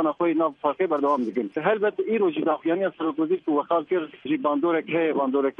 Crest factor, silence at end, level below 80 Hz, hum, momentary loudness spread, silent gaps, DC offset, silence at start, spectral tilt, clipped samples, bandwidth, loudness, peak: 16 dB; 0.05 s; -74 dBFS; none; 3 LU; none; under 0.1%; 0 s; -8 dB/octave; under 0.1%; 3.9 kHz; -24 LUFS; -8 dBFS